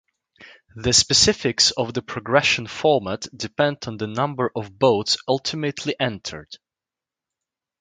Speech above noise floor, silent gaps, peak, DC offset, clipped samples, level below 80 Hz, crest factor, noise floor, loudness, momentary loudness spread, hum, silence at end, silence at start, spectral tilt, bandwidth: 67 dB; none; 0 dBFS; under 0.1%; under 0.1%; -50 dBFS; 22 dB; -89 dBFS; -20 LUFS; 14 LU; none; 1.25 s; 0.4 s; -3 dB/octave; 11 kHz